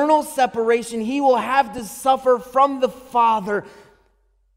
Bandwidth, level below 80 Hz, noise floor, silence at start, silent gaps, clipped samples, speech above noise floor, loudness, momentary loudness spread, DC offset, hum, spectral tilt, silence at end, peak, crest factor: 16 kHz; -58 dBFS; -62 dBFS; 0 s; none; under 0.1%; 43 dB; -19 LUFS; 7 LU; under 0.1%; none; -4 dB/octave; 0.85 s; -4 dBFS; 16 dB